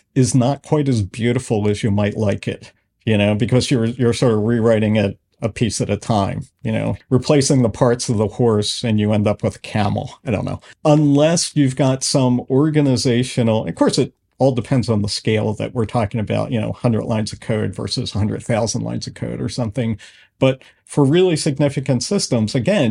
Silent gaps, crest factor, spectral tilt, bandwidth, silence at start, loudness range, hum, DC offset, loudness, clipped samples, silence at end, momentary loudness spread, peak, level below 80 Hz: none; 18 dB; -6 dB/octave; 11.5 kHz; 0.15 s; 5 LU; none; under 0.1%; -18 LUFS; under 0.1%; 0 s; 8 LU; 0 dBFS; -48 dBFS